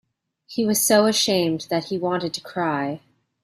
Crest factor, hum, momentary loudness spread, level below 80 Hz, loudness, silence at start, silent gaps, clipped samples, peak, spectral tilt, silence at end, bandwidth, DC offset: 18 dB; none; 12 LU; -64 dBFS; -21 LUFS; 0.5 s; none; under 0.1%; -4 dBFS; -3.5 dB/octave; 0.45 s; 16 kHz; under 0.1%